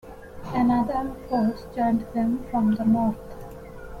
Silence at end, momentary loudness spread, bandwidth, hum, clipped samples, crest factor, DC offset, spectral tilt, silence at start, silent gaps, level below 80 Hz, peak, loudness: 0 s; 19 LU; 14 kHz; none; under 0.1%; 14 dB; under 0.1%; -8.5 dB/octave; 0.05 s; none; -46 dBFS; -12 dBFS; -24 LUFS